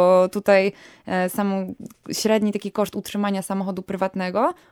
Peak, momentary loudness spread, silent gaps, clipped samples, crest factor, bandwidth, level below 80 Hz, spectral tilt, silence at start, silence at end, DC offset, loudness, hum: -4 dBFS; 10 LU; none; under 0.1%; 18 dB; 18 kHz; -62 dBFS; -5.5 dB/octave; 0 s; 0.2 s; under 0.1%; -22 LUFS; none